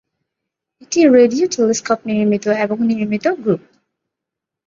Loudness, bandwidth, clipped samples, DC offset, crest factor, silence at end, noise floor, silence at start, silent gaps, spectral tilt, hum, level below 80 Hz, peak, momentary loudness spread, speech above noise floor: -16 LUFS; 7.6 kHz; under 0.1%; under 0.1%; 16 dB; 1.1 s; -83 dBFS; 0.9 s; none; -5 dB/octave; none; -60 dBFS; 0 dBFS; 9 LU; 68 dB